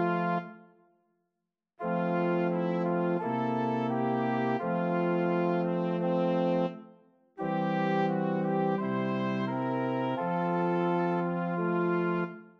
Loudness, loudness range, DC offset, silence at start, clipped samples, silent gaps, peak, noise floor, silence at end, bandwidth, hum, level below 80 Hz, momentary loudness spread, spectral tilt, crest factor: -30 LUFS; 2 LU; under 0.1%; 0 s; under 0.1%; none; -16 dBFS; -86 dBFS; 0.1 s; 6 kHz; none; -78 dBFS; 4 LU; -9.5 dB/octave; 14 dB